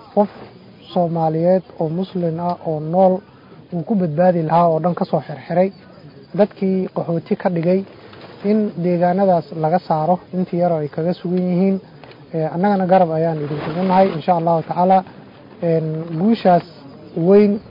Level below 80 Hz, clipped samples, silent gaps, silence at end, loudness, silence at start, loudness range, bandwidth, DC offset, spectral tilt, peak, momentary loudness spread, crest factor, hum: -60 dBFS; under 0.1%; none; 0 s; -18 LUFS; 0.15 s; 3 LU; 5.4 kHz; under 0.1%; -11 dB/octave; -2 dBFS; 9 LU; 14 dB; none